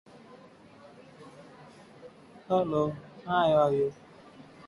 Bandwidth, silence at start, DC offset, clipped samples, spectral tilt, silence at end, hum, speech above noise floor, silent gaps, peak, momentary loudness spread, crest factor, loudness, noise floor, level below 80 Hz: 11.5 kHz; 0.35 s; under 0.1%; under 0.1%; -7.5 dB/octave; 0.25 s; none; 27 dB; none; -12 dBFS; 27 LU; 20 dB; -28 LUFS; -53 dBFS; -64 dBFS